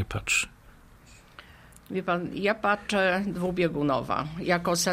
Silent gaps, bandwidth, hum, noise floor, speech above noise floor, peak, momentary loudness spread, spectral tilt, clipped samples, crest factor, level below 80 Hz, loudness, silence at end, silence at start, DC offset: none; 15.5 kHz; none; -53 dBFS; 26 dB; -10 dBFS; 6 LU; -4 dB/octave; under 0.1%; 18 dB; -52 dBFS; -27 LUFS; 0 s; 0 s; under 0.1%